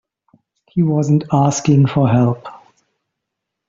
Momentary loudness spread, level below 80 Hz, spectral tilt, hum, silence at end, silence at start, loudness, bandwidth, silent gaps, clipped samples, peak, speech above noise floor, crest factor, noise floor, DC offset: 11 LU; -52 dBFS; -7 dB/octave; none; 1.1 s; 0.75 s; -15 LUFS; 7.6 kHz; none; under 0.1%; -2 dBFS; 65 dB; 14 dB; -79 dBFS; under 0.1%